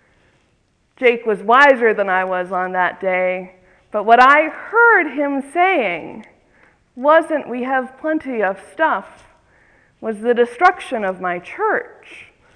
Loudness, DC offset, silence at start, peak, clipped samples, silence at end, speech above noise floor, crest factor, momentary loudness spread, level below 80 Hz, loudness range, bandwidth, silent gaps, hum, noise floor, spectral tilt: -16 LUFS; under 0.1%; 1 s; 0 dBFS; under 0.1%; 0.3 s; 45 dB; 18 dB; 12 LU; -62 dBFS; 6 LU; 10.5 kHz; none; none; -61 dBFS; -5 dB/octave